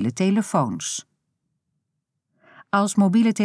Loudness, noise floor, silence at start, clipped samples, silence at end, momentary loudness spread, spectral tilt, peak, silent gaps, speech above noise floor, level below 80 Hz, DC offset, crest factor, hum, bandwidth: -22 LUFS; -79 dBFS; 0 s; under 0.1%; 0 s; 10 LU; -5.5 dB/octave; -6 dBFS; none; 59 dB; -74 dBFS; under 0.1%; 16 dB; none; 11 kHz